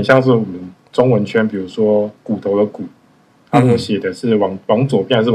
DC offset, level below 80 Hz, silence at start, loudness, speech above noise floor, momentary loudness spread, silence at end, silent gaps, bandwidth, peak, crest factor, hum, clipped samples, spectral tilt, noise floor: under 0.1%; -56 dBFS; 0 s; -16 LUFS; 37 dB; 9 LU; 0 s; none; 11 kHz; 0 dBFS; 16 dB; none; under 0.1%; -7.5 dB/octave; -51 dBFS